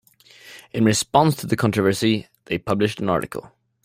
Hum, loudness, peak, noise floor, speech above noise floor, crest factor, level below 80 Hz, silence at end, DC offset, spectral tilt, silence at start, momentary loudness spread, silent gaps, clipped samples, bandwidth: none; -21 LUFS; -2 dBFS; -48 dBFS; 28 dB; 20 dB; -54 dBFS; 0.4 s; under 0.1%; -5 dB/octave; 0.45 s; 11 LU; none; under 0.1%; 16 kHz